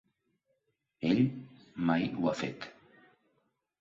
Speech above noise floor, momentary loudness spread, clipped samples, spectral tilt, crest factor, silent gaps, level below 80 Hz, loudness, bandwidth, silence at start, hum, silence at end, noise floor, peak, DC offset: 49 dB; 19 LU; under 0.1%; -7 dB/octave; 20 dB; none; -68 dBFS; -32 LUFS; 7.6 kHz; 1 s; none; 1.1 s; -80 dBFS; -16 dBFS; under 0.1%